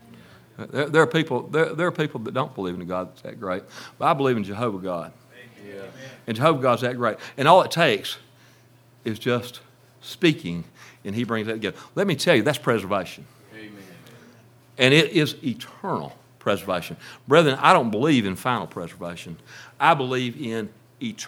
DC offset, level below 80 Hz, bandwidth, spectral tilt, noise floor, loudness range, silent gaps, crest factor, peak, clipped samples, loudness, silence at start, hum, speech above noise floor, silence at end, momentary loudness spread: under 0.1%; -68 dBFS; 17.5 kHz; -5.5 dB/octave; -54 dBFS; 6 LU; none; 24 dB; 0 dBFS; under 0.1%; -22 LUFS; 0.6 s; none; 31 dB; 0 s; 22 LU